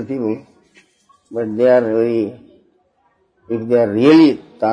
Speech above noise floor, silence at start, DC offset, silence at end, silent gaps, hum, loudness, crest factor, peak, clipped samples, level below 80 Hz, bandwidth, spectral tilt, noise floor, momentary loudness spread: 46 dB; 0 s; under 0.1%; 0 s; none; none; -15 LUFS; 16 dB; 0 dBFS; under 0.1%; -62 dBFS; 7 kHz; -7.5 dB/octave; -61 dBFS; 16 LU